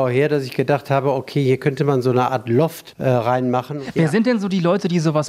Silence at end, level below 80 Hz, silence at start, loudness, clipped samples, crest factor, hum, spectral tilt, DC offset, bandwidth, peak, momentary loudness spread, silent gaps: 0 s; -60 dBFS; 0 s; -19 LUFS; under 0.1%; 16 dB; none; -7 dB/octave; under 0.1%; 15.5 kHz; -4 dBFS; 4 LU; none